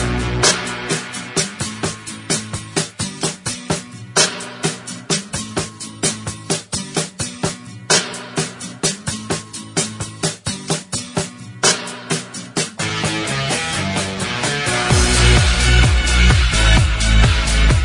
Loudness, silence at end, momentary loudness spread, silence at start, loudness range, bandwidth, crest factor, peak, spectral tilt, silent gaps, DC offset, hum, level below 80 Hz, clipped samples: -18 LUFS; 0 s; 11 LU; 0 s; 8 LU; 11 kHz; 18 dB; 0 dBFS; -3 dB/octave; none; under 0.1%; none; -22 dBFS; under 0.1%